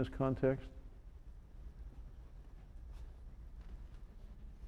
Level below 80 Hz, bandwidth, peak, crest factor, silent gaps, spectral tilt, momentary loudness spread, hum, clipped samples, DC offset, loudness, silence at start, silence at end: -52 dBFS; 9.6 kHz; -22 dBFS; 22 dB; none; -9 dB/octave; 22 LU; none; under 0.1%; under 0.1%; -39 LUFS; 0 s; 0 s